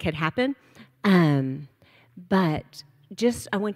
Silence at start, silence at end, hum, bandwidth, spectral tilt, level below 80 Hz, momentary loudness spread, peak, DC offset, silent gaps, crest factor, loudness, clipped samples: 0 s; 0 s; none; 15 kHz; -6.5 dB/octave; -56 dBFS; 20 LU; -6 dBFS; under 0.1%; none; 18 dB; -24 LUFS; under 0.1%